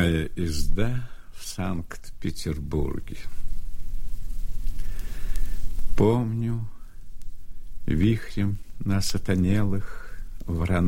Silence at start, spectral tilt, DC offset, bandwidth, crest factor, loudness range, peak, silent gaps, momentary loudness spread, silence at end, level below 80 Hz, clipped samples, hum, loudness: 0 s; -6.5 dB/octave; under 0.1%; 15.5 kHz; 14 dB; 7 LU; -8 dBFS; none; 18 LU; 0 s; -32 dBFS; under 0.1%; none; -28 LUFS